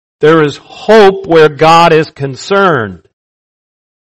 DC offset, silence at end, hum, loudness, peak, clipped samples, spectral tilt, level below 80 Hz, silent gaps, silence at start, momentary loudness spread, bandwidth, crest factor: under 0.1%; 1.2 s; none; -7 LUFS; 0 dBFS; 4%; -5.5 dB/octave; -44 dBFS; none; 0.2 s; 13 LU; 11 kHz; 10 dB